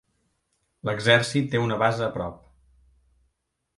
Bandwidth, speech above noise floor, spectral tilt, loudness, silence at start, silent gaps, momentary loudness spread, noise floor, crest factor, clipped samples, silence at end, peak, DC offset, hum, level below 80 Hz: 11.5 kHz; 53 dB; -5 dB/octave; -24 LUFS; 0.85 s; none; 14 LU; -76 dBFS; 24 dB; under 0.1%; 1.4 s; -4 dBFS; under 0.1%; none; -56 dBFS